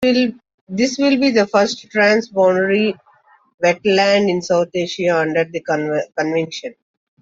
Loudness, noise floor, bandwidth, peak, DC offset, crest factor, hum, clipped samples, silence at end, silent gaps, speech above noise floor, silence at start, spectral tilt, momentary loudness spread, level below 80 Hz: -17 LUFS; -53 dBFS; 7.8 kHz; -2 dBFS; under 0.1%; 14 dB; none; under 0.1%; 0.5 s; 0.54-0.67 s, 3.54-3.58 s; 37 dB; 0 s; -4.5 dB/octave; 7 LU; -60 dBFS